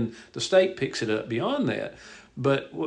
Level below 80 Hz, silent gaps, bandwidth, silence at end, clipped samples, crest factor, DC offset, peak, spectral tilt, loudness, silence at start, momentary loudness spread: -64 dBFS; none; 10 kHz; 0 s; under 0.1%; 18 dB; under 0.1%; -8 dBFS; -5 dB/octave; -26 LUFS; 0 s; 14 LU